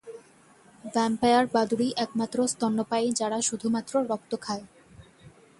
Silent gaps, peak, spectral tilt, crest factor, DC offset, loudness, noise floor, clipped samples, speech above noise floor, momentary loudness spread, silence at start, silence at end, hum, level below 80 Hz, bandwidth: none; -10 dBFS; -3.5 dB/octave; 18 dB; under 0.1%; -27 LUFS; -57 dBFS; under 0.1%; 30 dB; 10 LU; 0.05 s; 0.3 s; none; -64 dBFS; 11.5 kHz